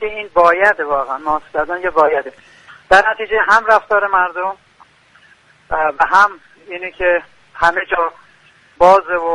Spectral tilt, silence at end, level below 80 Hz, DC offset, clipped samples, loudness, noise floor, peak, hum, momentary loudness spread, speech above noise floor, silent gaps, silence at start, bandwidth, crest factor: -3.5 dB/octave; 0 s; -44 dBFS; under 0.1%; under 0.1%; -14 LUFS; -49 dBFS; 0 dBFS; none; 12 LU; 35 dB; none; 0 s; 11 kHz; 16 dB